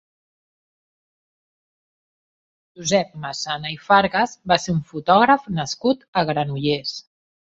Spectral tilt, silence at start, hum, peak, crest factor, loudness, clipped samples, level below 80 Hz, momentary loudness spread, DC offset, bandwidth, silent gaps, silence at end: -4.5 dB/octave; 2.8 s; none; -2 dBFS; 22 dB; -20 LUFS; under 0.1%; -56 dBFS; 12 LU; under 0.1%; 8.2 kHz; 6.08-6.13 s; 0.45 s